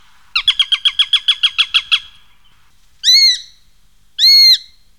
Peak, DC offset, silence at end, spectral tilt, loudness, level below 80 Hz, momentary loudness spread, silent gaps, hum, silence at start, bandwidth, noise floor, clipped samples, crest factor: -2 dBFS; 0.5%; 0.4 s; 5.5 dB/octave; -10 LUFS; -52 dBFS; 10 LU; none; 50 Hz at -70 dBFS; 0.35 s; 18 kHz; -54 dBFS; under 0.1%; 12 dB